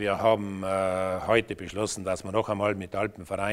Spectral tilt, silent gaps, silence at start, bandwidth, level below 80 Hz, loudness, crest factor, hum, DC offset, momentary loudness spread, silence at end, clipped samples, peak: -5 dB/octave; none; 0 s; 15.5 kHz; -54 dBFS; -28 LUFS; 20 dB; none; under 0.1%; 7 LU; 0 s; under 0.1%; -8 dBFS